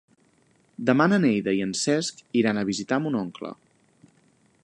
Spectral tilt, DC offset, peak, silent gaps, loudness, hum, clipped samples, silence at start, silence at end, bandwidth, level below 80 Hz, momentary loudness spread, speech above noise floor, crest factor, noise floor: -5 dB/octave; under 0.1%; -4 dBFS; none; -24 LUFS; none; under 0.1%; 0.8 s; 1.1 s; 11.5 kHz; -66 dBFS; 10 LU; 39 dB; 20 dB; -63 dBFS